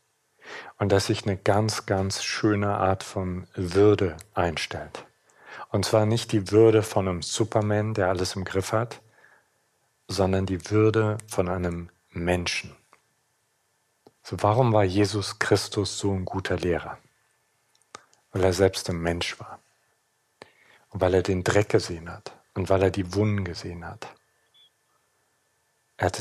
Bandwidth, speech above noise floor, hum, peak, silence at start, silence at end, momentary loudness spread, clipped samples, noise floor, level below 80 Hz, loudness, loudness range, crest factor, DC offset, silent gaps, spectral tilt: 14 kHz; 46 dB; none; -6 dBFS; 0.45 s; 0 s; 18 LU; under 0.1%; -71 dBFS; -54 dBFS; -25 LUFS; 5 LU; 20 dB; under 0.1%; none; -5.5 dB/octave